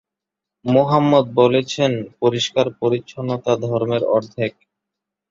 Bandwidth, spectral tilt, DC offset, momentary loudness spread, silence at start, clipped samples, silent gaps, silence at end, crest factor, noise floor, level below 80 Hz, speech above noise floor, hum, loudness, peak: 7.6 kHz; -6 dB/octave; under 0.1%; 10 LU; 0.65 s; under 0.1%; none; 0.8 s; 18 dB; -85 dBFS; -58 dBFS; 67 dB; none; -19 LUFS; -2 dBFS